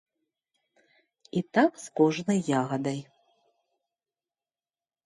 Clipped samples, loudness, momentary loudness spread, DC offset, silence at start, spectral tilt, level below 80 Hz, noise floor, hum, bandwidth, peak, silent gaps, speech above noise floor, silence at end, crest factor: under 0.1%; -27 LUFS; 9 LU; under 0.1%; 1.35 s; -6 dB/octave; -74 dBFS; under -90 dBFS; none; 11.5 kHz; -10 dBFS; none; over 64 dB; 2.05 s; 20 dB